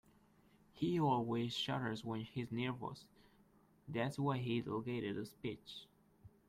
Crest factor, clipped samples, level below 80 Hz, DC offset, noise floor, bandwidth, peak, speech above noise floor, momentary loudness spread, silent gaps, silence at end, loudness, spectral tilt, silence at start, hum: 18 dB; under 0.1%; -72 dBFS; under 0.1%; -70 dBFS; 15 kHz; -24 dBFS; 30 dB; 12 LU; none; 0.2 s; -41 LUFS; -6.5 dB/octave; 0.75 s; none